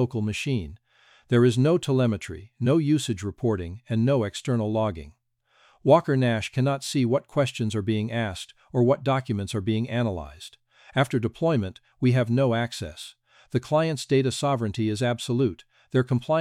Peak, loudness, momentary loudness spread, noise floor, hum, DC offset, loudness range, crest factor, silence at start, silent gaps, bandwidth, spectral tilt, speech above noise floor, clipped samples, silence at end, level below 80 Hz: -4 dBFS; -25 LUFS; 10 LU; -64 dBFS; none; under 0.1%; 2 LU; 20 dB; 0 s; none; 14 kHz; -6.5 dB/octave; 40 dB; under 0.1%; 0 s; -56 dBFS